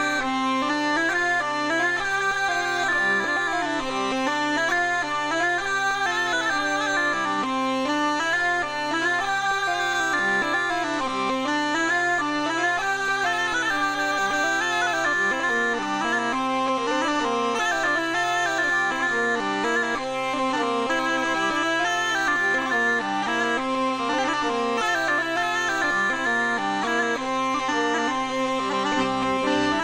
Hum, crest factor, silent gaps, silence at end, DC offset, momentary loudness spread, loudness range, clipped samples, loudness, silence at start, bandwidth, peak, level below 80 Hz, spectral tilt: none; 14 dB; none; 0 s; under 0.1%; 3 LU; 1 LU; under 0.1%; -23 LUFS; 0 s; 16.5 kHz; -10 dBFS; -56 dBFS; -2.5 dB/octave